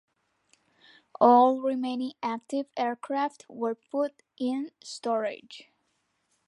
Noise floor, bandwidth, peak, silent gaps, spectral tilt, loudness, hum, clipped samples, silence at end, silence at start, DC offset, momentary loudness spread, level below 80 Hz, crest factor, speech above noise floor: -75 dBFS; 11 kHz; -6 dBFS; none; -4.5 dB/octave; -28 LUFS; none; under 0.1%; 0.85 s; 1.2 s; under 0.1%; 15 LU; -84 dBFS; 22 dB; 48 dB